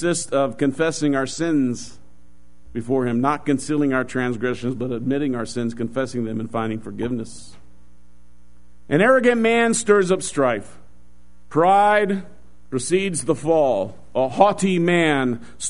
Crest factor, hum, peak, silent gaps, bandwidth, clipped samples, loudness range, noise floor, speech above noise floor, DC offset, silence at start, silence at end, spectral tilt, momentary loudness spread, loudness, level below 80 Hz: 20 dB; none; 0 dBFS; none; 11 kHz; under 0.1%; 7 LU; -54 dBFS; 34 dB; 2%; 0 s; 0 s; -5 dB/octave; 11 LU; -20 LUFS; -52 dBFS